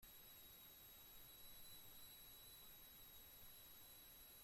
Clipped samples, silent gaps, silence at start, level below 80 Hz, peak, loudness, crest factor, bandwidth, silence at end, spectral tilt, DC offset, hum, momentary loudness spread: under 0.1%; none; 0 s; -74 dBFS; -50 dBFS; -60 LUFS; 14 dB; 16.5 kHz; 0 s; -1 dB/octave; under 0.1%; none; 1 LU